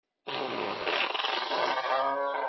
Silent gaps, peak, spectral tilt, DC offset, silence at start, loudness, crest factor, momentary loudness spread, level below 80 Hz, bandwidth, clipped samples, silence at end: none; -14 dBFS; -3 dB/octave; under 0.1%; 0.25 s; -30 LUFS; 16 dB; 6 LU; -78 dBFS; 6 kHz; under 0.1%; 0 s